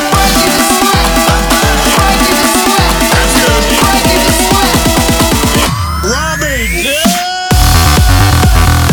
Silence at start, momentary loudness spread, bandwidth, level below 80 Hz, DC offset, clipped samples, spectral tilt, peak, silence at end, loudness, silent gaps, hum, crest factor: 0 s; 5 LU; over 20 kHz; -16 dBFS; under 0.1%; 0.2%; -3.5 dB/octave; 0 dBFS; 0 s; -8 LUFS; none; none; 8 dB